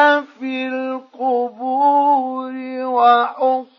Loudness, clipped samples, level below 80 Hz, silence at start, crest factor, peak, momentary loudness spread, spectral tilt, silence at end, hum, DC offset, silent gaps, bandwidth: -18 LUFS; under 0.1%; -86 dBFS; 0 s; 16 dB; -2 dBFS; 12 LU; -4.5 dB/octave; 0.15 s; none; under 0.1%; none; 6.2 kHz